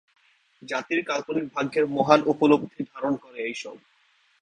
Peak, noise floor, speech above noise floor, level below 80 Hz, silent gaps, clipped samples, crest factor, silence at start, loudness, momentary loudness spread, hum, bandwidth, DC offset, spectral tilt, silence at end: -2 dBFS; -64 dBFS; 39 dB; -66 dBFS; none; under 0.1%; 24 dB; 0.65 s; -25 LUFS; 12 LU; none; 9.6 kHz; under 0.1%; -5.5 dB/octave; 0.65 s